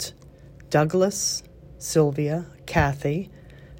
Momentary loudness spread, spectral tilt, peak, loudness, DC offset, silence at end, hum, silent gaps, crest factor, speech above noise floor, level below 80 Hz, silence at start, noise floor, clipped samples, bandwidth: 10 LU; -4.5 dB/octave; -6 dBFS; -24 LUFS; under 0.1%; 0 s; none; none; 18 dB; 24 dB; -46 dBFS; 0 s; -47 dBFS; under 0.1%; 16 kHz